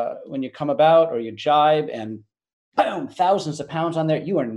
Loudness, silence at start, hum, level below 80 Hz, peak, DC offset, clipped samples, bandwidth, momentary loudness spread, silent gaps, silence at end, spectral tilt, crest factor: -21 LUFS; 0 s; none; -68 dBFS; -4 dBFS; under 0.1%; under 0.1%; 10.5 kHz; 14 LU; 2.53-2.72 s; 0 s; -6 dB/octave; 16 dB